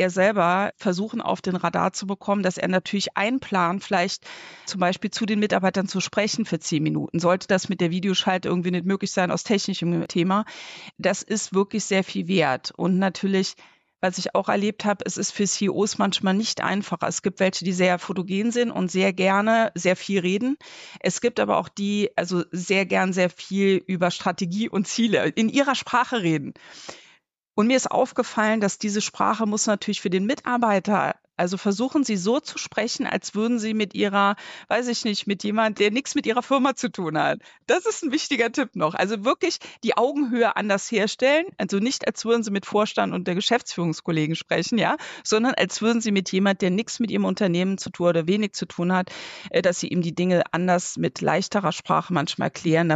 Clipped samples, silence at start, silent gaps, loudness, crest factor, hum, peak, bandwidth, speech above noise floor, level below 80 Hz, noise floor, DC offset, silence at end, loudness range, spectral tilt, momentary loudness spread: under 0.1%; 0 s; none; -23 LUFS; 16 dB; none; -8 dBFS; 9 kHz; 37 dB; -68 dBFS; -60 dBFS; under 0.1%; 0 s; 2 LU; -4.5 dB/octave; 5 LU